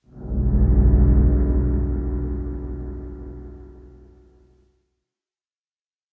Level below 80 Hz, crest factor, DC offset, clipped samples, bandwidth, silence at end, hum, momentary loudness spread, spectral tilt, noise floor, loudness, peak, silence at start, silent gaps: -22 dBFS; 16 dB; under 0.1%; under 0.1%; 2 kHz; 2.25 s; none; 21 LU; -14 dB/octave; under -90 dBFS; -21 LUFS; -6 dBFS; 0.15 s; none